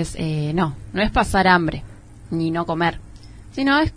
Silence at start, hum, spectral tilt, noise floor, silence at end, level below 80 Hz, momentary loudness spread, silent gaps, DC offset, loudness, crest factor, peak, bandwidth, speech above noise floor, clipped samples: 0 s; none; -6 dB/octave; -40 dBFS; 0 s; -36 dBFS; 13 LU; none; under 0.1%; -20 LUFS; 20 dB; -2 dBFS; 11 kHz; 20 dB; under 0.1%